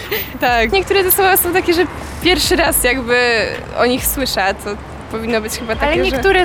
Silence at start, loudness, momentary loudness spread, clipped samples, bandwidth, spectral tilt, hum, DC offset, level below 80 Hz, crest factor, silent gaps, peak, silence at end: 0 s; -14 LUFS; 9 LU; under 0.1%; over 20 kHz; -3 dB/octave; none; 0.3%; -32 dBFS; 14 dB; none; -2 dBFS; 0 s